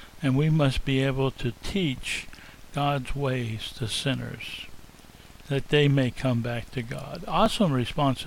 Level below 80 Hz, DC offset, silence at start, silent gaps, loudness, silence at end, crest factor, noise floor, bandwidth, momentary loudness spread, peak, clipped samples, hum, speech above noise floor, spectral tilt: -42 dBFS; under 0.1%; 0 s; none; -27 LUFS; 0 s; 18 dB; -49 dBFS; 16 kHz; 13 LU; -10 dBFS; under 0.1%; none; 23 dB; -6 dB/octave